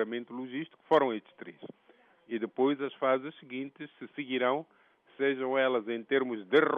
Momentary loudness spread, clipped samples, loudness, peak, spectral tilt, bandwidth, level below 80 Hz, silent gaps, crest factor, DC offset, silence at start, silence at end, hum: 17 LU; under 0.1%; -31 LUFS; -12 dBFS; -2.5 dB/octave; 4.9 kHz; -84 dBFS; none; 20 dB; under 0.1%; 0 s; 0 s; none